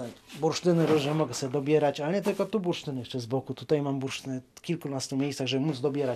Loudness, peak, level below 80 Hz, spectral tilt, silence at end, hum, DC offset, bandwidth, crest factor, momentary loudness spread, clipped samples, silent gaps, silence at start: -29 LUFS; -12 dBFS; -68 dBFS; -5.5 dB/octave; 0 s; none; under 0.1%; 14.5 kHz; 16 dB; 10 LU; under 0.1%; none; 0 s